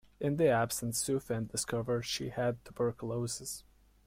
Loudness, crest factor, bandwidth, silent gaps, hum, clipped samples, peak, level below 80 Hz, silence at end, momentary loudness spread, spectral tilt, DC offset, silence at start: -34 LUFS; 18 dB; 16.5 kHz; none; none; under 0.1%; -16 dBFS; -60 dBFS; 0.45 s; 9 LU; -4.5 dB/octave; under 0.1%; 0.2 s